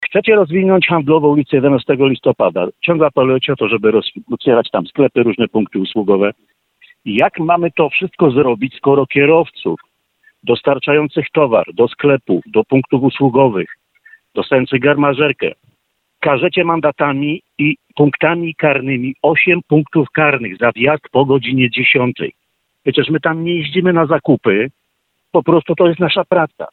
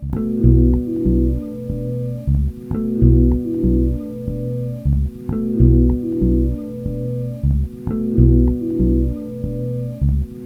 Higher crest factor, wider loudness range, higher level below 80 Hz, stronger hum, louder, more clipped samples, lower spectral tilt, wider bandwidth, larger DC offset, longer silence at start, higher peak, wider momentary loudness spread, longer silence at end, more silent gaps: about the same, 14 dB vs 16 dB; about the same, 3 LU vs 2 LU; second, -54 dBFS vs -20 dBFS; neither; first, -14 LUFS vs -19 LUFS; neither; second, -9.5 dB/octave vs -12 dB/octave; first, 4.3 kHz vs 1.7 kHz; neither; about the same, 0 s vs 0 s; about the same, 0 dBFS vs 0 dBFS; second, 7 LU vs 11 LU; about the same, 0.05 s vs 0 s; neither